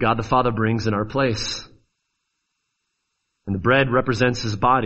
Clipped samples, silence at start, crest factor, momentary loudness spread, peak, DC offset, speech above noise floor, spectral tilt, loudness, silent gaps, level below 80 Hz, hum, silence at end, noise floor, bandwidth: under 0.1%; 0 s; 20 dB; 10 LU; -2 dBFS; under 0.1%; 56 dB; -5.5 dB/octave; -21 LUFS; none; -44 dBFS; none; 0 s; -76 dBFS; 8.2 kHz